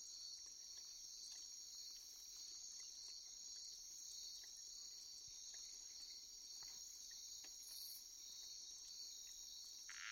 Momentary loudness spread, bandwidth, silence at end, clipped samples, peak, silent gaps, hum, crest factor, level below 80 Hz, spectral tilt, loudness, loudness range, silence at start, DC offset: 2 LU; 16 kHz; 0 s; under 0.1%; -38 dBFS; none; none; 18 dB; -82 dBFS; 3 dB/octave; -53 LUFS; 0 LU; 0 s; under 0.1%